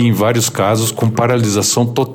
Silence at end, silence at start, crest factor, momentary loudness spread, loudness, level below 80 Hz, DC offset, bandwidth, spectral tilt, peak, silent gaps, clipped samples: 0 s; 0 s; 10 dB; 2 LU; -14 LUFS; -58 dBFS; under 0.1%; 17 kHz; -4.5 dB/octave; -2 dBFS; none; under 0.1%